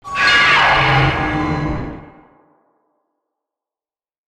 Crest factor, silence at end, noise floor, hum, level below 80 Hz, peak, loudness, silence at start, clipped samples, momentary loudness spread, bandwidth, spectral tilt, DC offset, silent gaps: 16 dB; 2.2 s; under -90 dBFS; none; -36 dBFS; -2 dBFS; -13 LUFS; 0.05 s; under 0.1%; 14 LU; 11 kHz; -4.5 dB/octave; under 0.1%; none